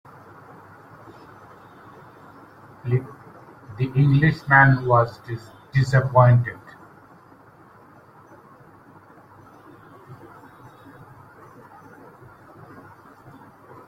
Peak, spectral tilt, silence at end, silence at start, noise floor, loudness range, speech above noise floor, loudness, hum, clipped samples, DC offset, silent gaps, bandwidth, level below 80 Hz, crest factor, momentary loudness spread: -2 dBFS; -8.5 dB/octave; 3.75 s; 2.85 s; -50 dBFS; 16 LU; 32 dB; -19 LUFS; none; under 0.1%; under 0.1%; none; 7.8 kHz; -54 dBFS; 22 dB; 29 LU